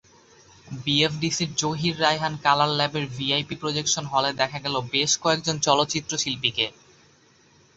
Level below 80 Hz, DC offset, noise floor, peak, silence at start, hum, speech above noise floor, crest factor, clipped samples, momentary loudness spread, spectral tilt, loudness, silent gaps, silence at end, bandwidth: -58 dBFS; under 0.1%; -57 dBFS; -4 dBFS; 0.65 s; none; 33 dB; 22 dB; under 0.1%; 6 LU; -3 dB/octave; -23 LUFS; none; 1.05 s; 8.2 kHz